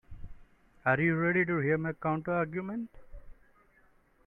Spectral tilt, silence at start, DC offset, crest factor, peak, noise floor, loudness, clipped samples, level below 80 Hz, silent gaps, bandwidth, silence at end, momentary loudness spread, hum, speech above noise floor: -10.5 dB/octave; 0.1 s; under 0.1%; 20 dB; -14 dBFS; -65 dBFS; -30 LUFS; under 0.1%; -56 dBFS; none; 3.9 kHz; 0.95 s; 11 LU; none; 35 dB